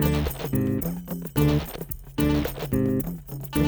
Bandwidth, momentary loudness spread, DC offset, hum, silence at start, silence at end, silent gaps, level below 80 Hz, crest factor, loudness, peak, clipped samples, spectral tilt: over 20 kHz; 10 LU; under 0.1%; none; 0 s; 0 s; none; -36 dBFS; 16 dB; -26 LUFS; -8 dBFS; under 0.1%; -6.5 dB/octave